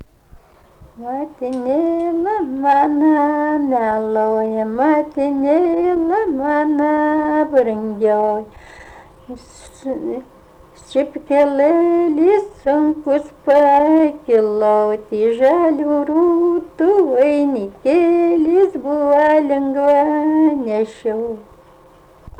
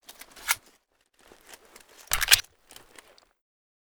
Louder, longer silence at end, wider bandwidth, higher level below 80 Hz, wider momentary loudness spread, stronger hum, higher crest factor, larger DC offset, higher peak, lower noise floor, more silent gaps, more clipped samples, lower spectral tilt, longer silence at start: first, -16 LUFS vs -24 LUFS; second, 0.1 s vs 1.5 s; second, 9 kHz vs over 20 kHz; about the same, -52 dBFS vs -50 dBFS; second, 11 LU vs 17 LU; neither; second, 12 dB vs 32 dB; neither; second, -4 dBFS vs 0 dBFS; second, -46 dBFS vs -67 dBFS; neither; neither; first, -7 dB/octave vs 2 dB/octave; second, 0 s vs 0.35 s